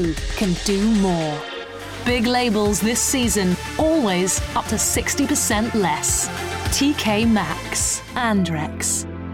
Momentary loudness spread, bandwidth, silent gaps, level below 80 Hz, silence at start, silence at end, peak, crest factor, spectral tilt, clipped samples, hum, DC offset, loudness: 6 LU; 17 kHz; none; -36 dBFS; 0 s; 0 s; -6 dBFS; 14 dB; -3.5 dB/octave; under 0.1%; none; under 0.1%; -20 LUFS